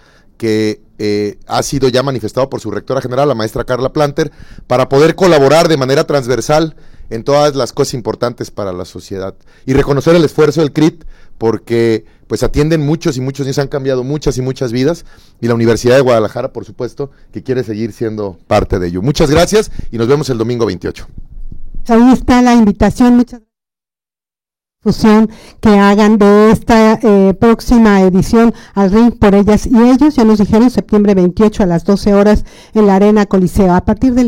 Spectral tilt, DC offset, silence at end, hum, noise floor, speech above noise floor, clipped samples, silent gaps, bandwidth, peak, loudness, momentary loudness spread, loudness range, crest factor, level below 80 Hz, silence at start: -6.5 dB/octave; under 0.1%; 0 s; none; under -90 dBFS; over 79 dB; under 0.1%; none; 16.5 kHz; 0 dBFS; -11 LUFS; 13 LU; 7 LU; 10 dB; -28 dBFS; 0.4 s